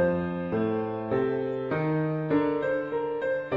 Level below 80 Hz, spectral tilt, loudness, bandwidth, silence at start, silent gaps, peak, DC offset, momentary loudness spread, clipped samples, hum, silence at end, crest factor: -60 dBFS; -10 dB/octave; -28 LUFS; 5.4 kHz; 0 s; none; -14 dBFS; under 0.1%; 4 LU; under 0.1%; none; 0 s; 14 dB